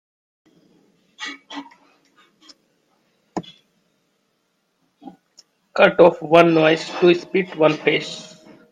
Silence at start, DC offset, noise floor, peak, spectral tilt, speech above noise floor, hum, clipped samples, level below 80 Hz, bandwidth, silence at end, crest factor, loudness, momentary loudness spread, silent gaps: 1.2 s; under 0.1%; -69 dBFS; 0 dBFS; -6 dB/octave; 53 dB; none; under 0.1%; -66 dBFS; 9.6 kHz; 0.5 s; 22 dB; -16 LUFS; 21 LU; none